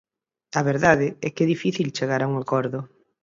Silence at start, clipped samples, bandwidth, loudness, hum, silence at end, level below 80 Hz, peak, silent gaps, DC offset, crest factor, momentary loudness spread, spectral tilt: 0.55 s; under 0.1%; 7.8 kHz; -23 LUFS; none; 0.35 s; -58 dBFS; -2 dBFS; none; under 0.1%; 22 dB; 11 LU; -6 dB/octave